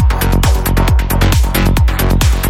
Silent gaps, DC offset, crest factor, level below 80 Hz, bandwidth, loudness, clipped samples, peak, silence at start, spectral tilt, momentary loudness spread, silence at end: none; under 0.1%; 10 dB; -12 dBFS; 17 kHz; -13 LUFS; under 0.1%; 0 dBFS; 0 s; -5 dB/octave; 1 LU; 0 s